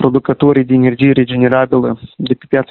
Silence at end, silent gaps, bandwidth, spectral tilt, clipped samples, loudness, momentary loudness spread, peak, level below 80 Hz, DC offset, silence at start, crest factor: 0.05 s; none; 4.3 kHz; -10.5 dB/octave; under 0.1%; -12 LUFS; 9 LU; 0 dBFS; -46 dBFS; under 0.1%; 0 s; 12 dB